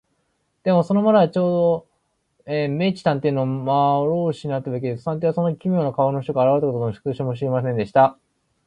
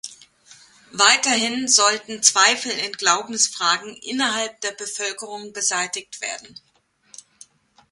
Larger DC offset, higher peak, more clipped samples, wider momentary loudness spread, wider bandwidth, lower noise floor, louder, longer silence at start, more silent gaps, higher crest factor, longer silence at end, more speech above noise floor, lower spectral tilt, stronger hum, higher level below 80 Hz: neither; about the same, -2 dBFS vs 0 dBFS; neither; second, 9 LU vs 15 LU; second, 9.6 kHz vs 16 kHz; first, -70 dBFS vs -53 dBFS; about the same, -21 LUFS vs -19 LUFS; first, 0.65 s vs 0.05 s; neither; about the same, 18 dB vs 22 dB; second, 0.55 s vs 1.45 s; first, 50 dB vs 31 dB; first, -9 dB/octave vs 0.5 dB/octave; neither; first, -60 dBFS vs -72 dBFS